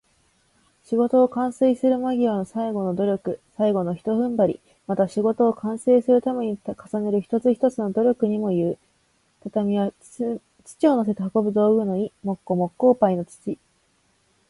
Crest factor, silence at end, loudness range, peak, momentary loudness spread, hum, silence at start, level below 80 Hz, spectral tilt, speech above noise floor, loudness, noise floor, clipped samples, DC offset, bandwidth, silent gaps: 16 dB; 0.95 s; 2 LU; -6 dBFS; 10 LU; none; 0.9 s; -64 dBFS; -8 dB/octave; 43 dB; -22 LUFS; -65 dBFS; under 0.1%; under 0.1%; 11.5 kHz; none